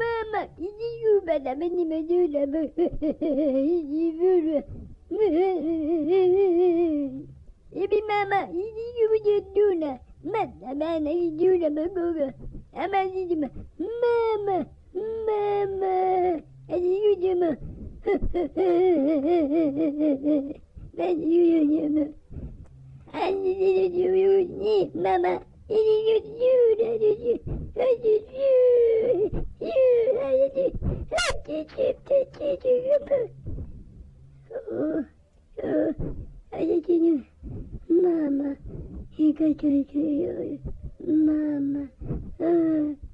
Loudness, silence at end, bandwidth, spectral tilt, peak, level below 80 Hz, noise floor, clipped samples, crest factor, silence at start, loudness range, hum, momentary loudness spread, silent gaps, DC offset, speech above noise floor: -24 LUFS; 0.05 s; 11 kHz; -7 dB/octave; -14 dBFS; -44 dBFS; -49 dBFS; under 0.1%; 10 dB; 0 s; 5 LU; none; 14 LU; none; under 0.1%; 25 dB